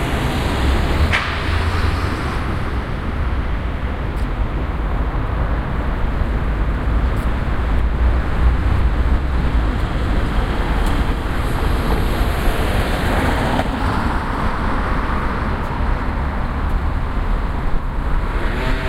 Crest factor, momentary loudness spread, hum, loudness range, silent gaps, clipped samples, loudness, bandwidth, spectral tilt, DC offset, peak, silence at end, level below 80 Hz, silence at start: 16 dB; 5 LU; none; 3 LU; none; under 0.1%; -21 LUFS; 14.5 kHz; -6.5 dB/octave; under 0.1%; -2 dBFS; 0 s; -20 dBFS; 0 s